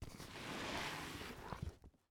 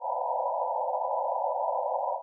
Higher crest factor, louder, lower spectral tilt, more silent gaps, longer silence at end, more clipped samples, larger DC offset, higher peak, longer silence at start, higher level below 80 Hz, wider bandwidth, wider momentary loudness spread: first, 20 dB vs 12 dB; second, -47 LUFS vs -30 LUFS; first, -4 dB/octave vs 3.5 dB/octave; neither; first, 0.2 s vs 0 s; neither; neither; second, -30 dBFS vs -18 dBFS; about the same, 0 s vs 0 s; first, -60 dBFS vs under -90 dBFS; first, over 20 kHz vs 1.1 kHz; first, 9 LU vs 1 LU